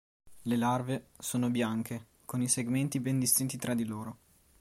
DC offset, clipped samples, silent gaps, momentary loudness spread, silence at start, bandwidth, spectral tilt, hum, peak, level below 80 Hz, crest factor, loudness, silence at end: under 0.1%; under 0.1%; none; 13 LU; 0.25 s; 16.5 kHz; -4.5 dB/octave; none; -12 dBFS; -68 dBFS; 20 dB; -31 LUFS; 0.45 s